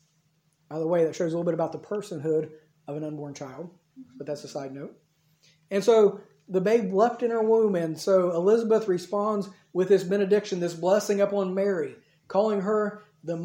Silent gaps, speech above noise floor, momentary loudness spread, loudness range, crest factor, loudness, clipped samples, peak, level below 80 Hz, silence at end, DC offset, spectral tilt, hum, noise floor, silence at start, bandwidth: none; 44 dB; 16 LU; 10 LU; 18 dB; -25 LUFS; under 0.1%; -8 dBFS; -78 dBFS; 0 s; under 0.1%; -6.5 dB/octave; none; -69 dBFS; 0.7 s; 16.5 kHz